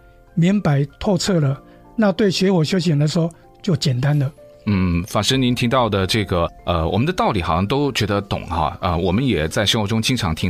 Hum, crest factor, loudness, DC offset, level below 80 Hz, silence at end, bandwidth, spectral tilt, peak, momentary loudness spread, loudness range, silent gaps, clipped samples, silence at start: none; 16 dB; -19 LUFS; under 0.1%; -38 dBFS; 0 s; 16 kHz; -5.5 dB/octave; -2 dBFS; 5 LU; 1 LU; none; under 0.1%; 0.35 s